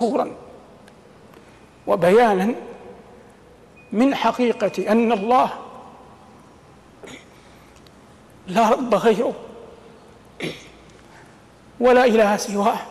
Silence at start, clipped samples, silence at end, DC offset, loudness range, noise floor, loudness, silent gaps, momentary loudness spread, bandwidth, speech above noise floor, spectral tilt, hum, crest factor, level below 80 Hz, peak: 0 s; under 0.1%; 0 s; under 0.1%; 5 LU; -48 dBFS; -19 LUFS; none; 25 LU; 14 kHz; 30 dB; -5.5 dB/octave; none; 16 dB; -56 dBFS; -6 dBFS